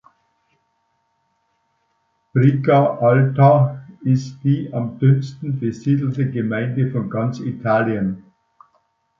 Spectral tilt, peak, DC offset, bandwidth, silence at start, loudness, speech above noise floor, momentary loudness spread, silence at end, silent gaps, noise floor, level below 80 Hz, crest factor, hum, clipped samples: -9.5 dB/octave; -2 dBFS; under 0.1%; 7 kHz; 2.35 s; -18 LUFS; 50 dB; 11 LU; 1 s; none; -68 dBFS; -58 dBFS; 18 dB; none; under 0.1%